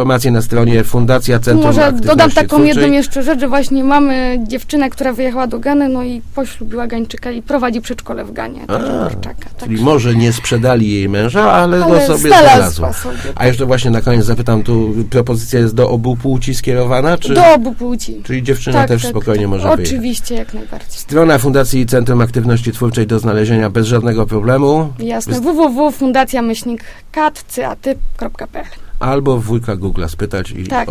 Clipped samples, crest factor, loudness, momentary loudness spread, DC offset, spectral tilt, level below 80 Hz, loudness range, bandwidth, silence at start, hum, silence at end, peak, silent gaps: 0.2%; 12 dB; -13 LUFS; 13 LU; under 0.1%; -6 dB/octave; -30 dBFS; 8 LU; 16 kHz; 0 s; none; 0 s; 0 dBFS; none